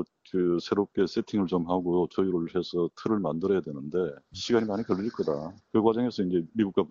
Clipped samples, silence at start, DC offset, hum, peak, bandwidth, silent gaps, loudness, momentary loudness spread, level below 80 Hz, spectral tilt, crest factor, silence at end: under 0.1%; 0 s; under 0.1%; none; -10 dBFS; 7.4 kHz; none; -28 LUFS; 5 LU; -62 dBFS; -6 dB/octave; 18 dB; 0.05 s